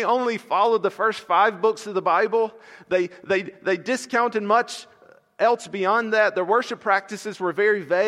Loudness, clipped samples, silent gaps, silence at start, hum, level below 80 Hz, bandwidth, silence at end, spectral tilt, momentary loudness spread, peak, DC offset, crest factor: -22 LUFS; under 0.1%; none; 0 s; none; -76 dBFS; 13 kHz; 0 s; -4 dB/octave; 6 LU; -6 dBFS; under 0.1%; 16 dB